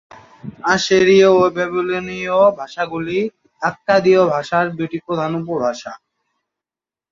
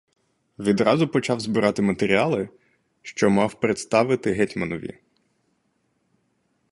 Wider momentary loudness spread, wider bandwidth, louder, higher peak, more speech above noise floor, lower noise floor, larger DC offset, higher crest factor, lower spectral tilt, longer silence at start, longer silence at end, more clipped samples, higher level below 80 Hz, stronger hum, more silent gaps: about the same, 13 LU vs 12 LU; second, 7.6 kHz vs 11.5 kHz; first, -17 LUFS vs -22 LUFS; about the same, -2 dBFS vs -4 dBFS; first, over 74 dB vs 48 dB; first, under -90 dBFS vs -70 dBFS; neither; about the same, 16 dB vs 20 dB; about the same, -5 dB/octave vs -6 dB/octave; second, 0.45 s vs 0.6 s; second, 1.15 s vs 1.8 s; neither; about the same, -56 dBFS vs -56 dBFS; neither; neither